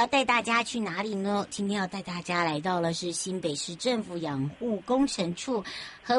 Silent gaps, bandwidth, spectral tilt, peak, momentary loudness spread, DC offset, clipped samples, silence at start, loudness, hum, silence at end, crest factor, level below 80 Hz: none; 11.5 kHz; -4 dB/octave; -10 dBFS; 8 LU; under 0.1%; under 0.1%; 0 s; -29 LUFS; none; 0 s; 18 dB; -62 dBFS